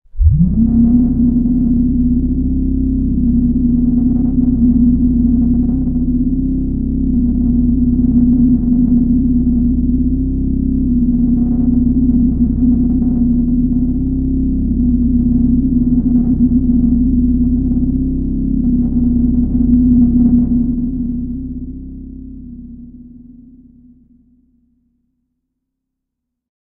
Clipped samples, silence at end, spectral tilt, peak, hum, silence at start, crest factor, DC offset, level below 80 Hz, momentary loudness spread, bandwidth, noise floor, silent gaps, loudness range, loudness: under 0.1%; 3.35 s; -16 dB/octave; 0 dBFS; none; 0.15 s; 14 dB; under 0.1%; -20 dBFS; 6 LU; 1.1 kHz; -77 dBFS; none; 2 LU; -14 LUFS